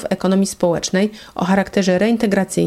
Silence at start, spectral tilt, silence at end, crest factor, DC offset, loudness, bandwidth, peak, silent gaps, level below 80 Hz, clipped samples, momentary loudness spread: 0 s; -5.5 dB/octave; 0 s; 14 dB; under 0.1%; -17 LUFS; 14.5 kHz; -4 dBFS; none; -48 dBFS; under 0.1%; 4 LU